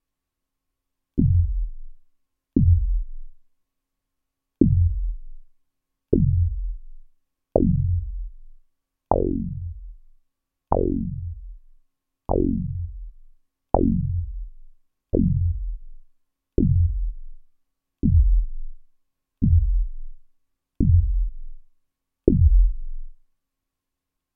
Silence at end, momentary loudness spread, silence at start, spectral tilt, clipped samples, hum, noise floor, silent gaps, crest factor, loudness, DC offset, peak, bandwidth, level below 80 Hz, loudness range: 1.2 s; 19 LU; 1.15 s; -16 dB/octave; under 0.1%; none; -83 dBFS; none; 24 dB; -23 LUFS; under 0.1%; 0 dBFS; 1.5 kHz; -28 dBFS; 4 LU